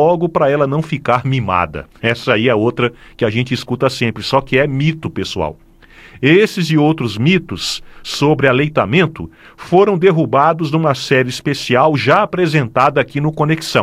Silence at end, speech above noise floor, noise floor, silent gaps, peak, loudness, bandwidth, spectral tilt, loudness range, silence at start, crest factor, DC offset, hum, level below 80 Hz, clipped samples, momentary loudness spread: 0 s; 27 dB; -42 dBFS; none; 0 dBFS; -15 LUFS; 14.5 kHz; -6 dB/octave; 3 LU; 0 s; 14 dB; under 0.1%; none; -44 dBFS; under 0.1%; 8 LU